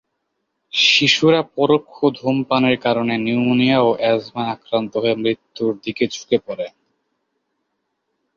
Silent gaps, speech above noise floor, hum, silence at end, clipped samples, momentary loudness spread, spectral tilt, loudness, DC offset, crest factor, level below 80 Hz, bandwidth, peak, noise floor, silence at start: none; 56 dB; none; 1.7 s; under 0.1%; 10 LU; -4.5 dB/octave; -18 LUFS; under 0.1%; 18 dB; -62 dBFS; 7.4 kHz; -2 dBFS; -74 dBFS; 0.75 s